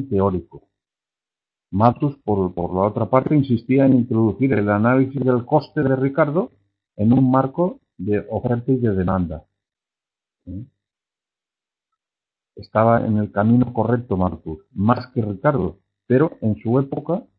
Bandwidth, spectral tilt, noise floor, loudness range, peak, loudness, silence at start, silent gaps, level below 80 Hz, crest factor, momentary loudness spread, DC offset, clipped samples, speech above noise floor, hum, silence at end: 5.4 kHz; -12.5 dB/octave; -90 dBFS; 7 LU; 0 dBFS; -19 LUFS; 0 s; none; -50 dBFS; 20 dB; 9 LU; under 0.1%; under 0.1%; 71 dB; none; 0.15 s